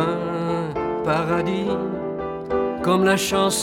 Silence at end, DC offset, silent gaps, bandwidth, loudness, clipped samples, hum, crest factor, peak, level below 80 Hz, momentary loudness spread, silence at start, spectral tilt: 0 s; under 0.1%; none; 17 kHz; -22 LUFS; under 0.1%; none; 16 dB; -6 dBFS; -48 dBFS; 8 LU; 0 s; -4.5 dB/octave